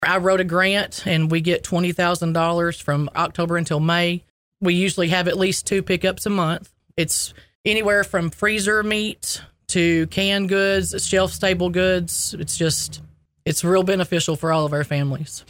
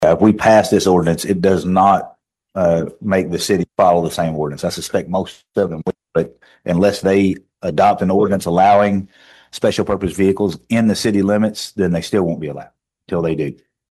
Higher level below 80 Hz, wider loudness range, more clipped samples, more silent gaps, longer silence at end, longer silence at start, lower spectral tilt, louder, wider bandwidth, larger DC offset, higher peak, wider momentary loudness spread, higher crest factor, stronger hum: about the same, -46 dBFS vs -46 dBFS; about the same, 1 LU vs 3 LU; neither; first, 4.30-4.52 s, 7.55-7.64 s vs none; second, 0.1 s vs 0.4 s; about the same, 0 s vs 0 s; second, -4 dB/octave vs -6 dB/octave; second, -20 LUFS vs -16 LUFS; first, 16.5 kHz vs 13 kHz; neither; about the same, -4 dBFS vs -2 dBFS; second, 6 LU vs 11 LU; about the same, 16 dB vs 16 dB; neither